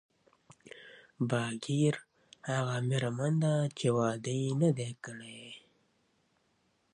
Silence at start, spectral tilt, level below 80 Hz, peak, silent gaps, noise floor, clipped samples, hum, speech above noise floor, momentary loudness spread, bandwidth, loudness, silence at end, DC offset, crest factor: 0.75 s; -6 dB/octave; -74 dBFS; -16 dBFS; none; -74 dBFS; under 0.1%; none; 43 dB; 20 LU; 10.5 kHz; -32 LUFS; 1.35 s; under 0.1%; 18 dB